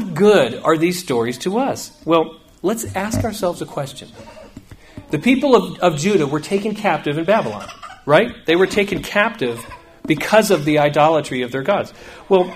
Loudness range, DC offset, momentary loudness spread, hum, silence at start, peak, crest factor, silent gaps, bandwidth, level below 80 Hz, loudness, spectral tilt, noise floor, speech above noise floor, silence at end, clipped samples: 5 LU; under 0.1%; 13 LU; none; 0 s; 0 dBFS; 18 dB; none; 15.5 kHz; -48 dBFS; -18 LUFS; -5 dB/octave; -40 dBFS; 23 dB; 0 s; under 0.1%